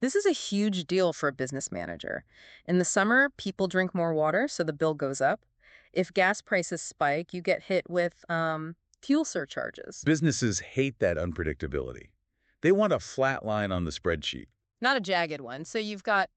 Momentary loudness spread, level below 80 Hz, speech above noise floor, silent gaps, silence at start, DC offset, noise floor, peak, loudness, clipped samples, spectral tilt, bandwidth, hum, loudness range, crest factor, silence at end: 10 LU; -56 dBFS; 45 dB; none; 0 s; under 0.1%; -73 dBFS; -12 dBFS; -28 LUFS; under 0.1%; -4.5 dB/octave; 9 kHz; none; 3 LU; 18 dB; 0.1 s